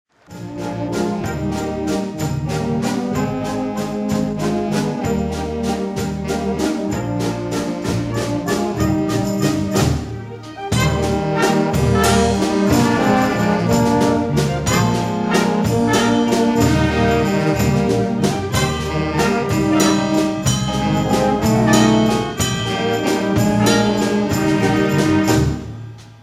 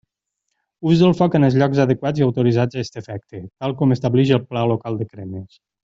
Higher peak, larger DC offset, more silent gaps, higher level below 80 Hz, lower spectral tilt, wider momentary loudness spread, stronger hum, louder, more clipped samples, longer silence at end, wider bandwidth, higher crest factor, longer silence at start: about the same, 0 dBFS vs -2 dBFS; neither; neither; first, -34 dBFS vs -54 dBFS; second, -5.5 dB/octave vs -8 dB/octave; second, 7 LU vs 17 LU; neither; about the same, -18 LUFS vs -18 LUFS; neither; second, 0.1 s vs 0.35 s; first, 16 kHz vs 7.6 kHz; about the same, 16 dB vs 16 dB; second, 0.3 s vs 0.8 s